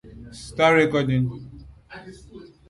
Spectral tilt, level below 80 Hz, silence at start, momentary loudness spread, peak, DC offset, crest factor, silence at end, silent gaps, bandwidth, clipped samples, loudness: -6.5 dB/octave; -50 dBFS; 0.1 s; 26 LU; -6 dBFS; under 0.1%; 18 dB; 0.25 s; none; 11.5 kHz; under 0.1%; -20 LUFS